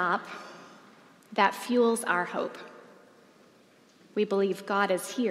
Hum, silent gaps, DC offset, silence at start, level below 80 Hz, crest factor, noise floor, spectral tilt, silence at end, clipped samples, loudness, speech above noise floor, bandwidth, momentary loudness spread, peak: none; none; under 0.1%; 0 s; -90 dBFS; 22 dB; -59 dBFS; -4 dB/octave; 0 s; under 0.1%; -28 LUFS; 32 dB; 16 kHz; 20 LU; -8 dBFS